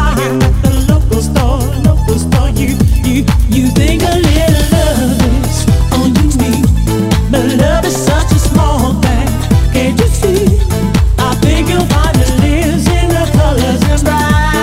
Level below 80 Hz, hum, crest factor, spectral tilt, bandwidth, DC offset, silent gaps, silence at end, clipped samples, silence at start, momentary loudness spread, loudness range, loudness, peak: -14 dBFS; none; 10 dB; -6 dB/octave; 16.5 kHz; under 0.1%; none; 0 s; 0.5%; 0 s; 2 LU; 1 LU; -11 LUFS; 0 dBFS